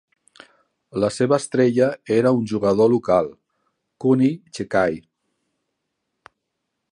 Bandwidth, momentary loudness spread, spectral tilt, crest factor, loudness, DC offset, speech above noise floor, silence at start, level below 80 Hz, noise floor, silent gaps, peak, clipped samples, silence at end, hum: 11 kHz; 8 LU; -6.5 dB/octave; 18 dB; -20 LUFS; under 0.1%; 59 dB; 0.95 s; -58 dBFS; -78 dBFS; none; -4 dBFS; under 0.1%; 1.9 s; none